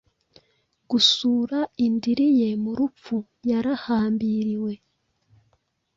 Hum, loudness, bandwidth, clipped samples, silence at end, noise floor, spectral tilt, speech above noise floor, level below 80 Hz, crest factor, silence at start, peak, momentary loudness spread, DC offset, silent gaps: none; -23 LUFS; 7.8 kHz; under 0.1%; 1.2 s; -69 dBFS; -4.5 dB/octave; 46 dB; -62 dBFS; 18 dB; 0.9 s; -6 dBFS; 11 LU; under 0.1%; none